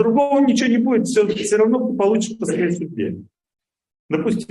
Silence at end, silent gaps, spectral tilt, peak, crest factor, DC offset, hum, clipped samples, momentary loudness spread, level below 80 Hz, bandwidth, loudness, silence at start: 0.05 s; 3.99-4.09 s; -5.5 dB/octave; -4 dBFS; 14 dB; under 0.1%; none; under 0.1%; 10 LU; -62 dBFS; 12 kHz; -18 LUFS; 0 s